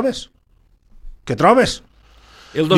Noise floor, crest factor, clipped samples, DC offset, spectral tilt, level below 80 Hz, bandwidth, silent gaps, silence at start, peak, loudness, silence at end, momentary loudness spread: -55 dBFS; 18 dB; under 0.1%; under 0.1%; -5 dB/octave; -44 dBFS; 14 kHz; none; 0 s; 0 dBFS; -17 LUFS; 0 s; 23 LU